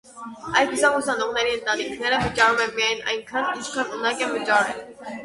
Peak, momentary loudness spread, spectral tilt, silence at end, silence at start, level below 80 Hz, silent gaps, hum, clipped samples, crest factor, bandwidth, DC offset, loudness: -4 dBFS; 9 LU; -2.5 dB/octave; 0 s; 0.05 s; -52 dBFS; none; none; under 0.1%; 18 dB; 11.5 kHz; under 0.1%; -22 LUFS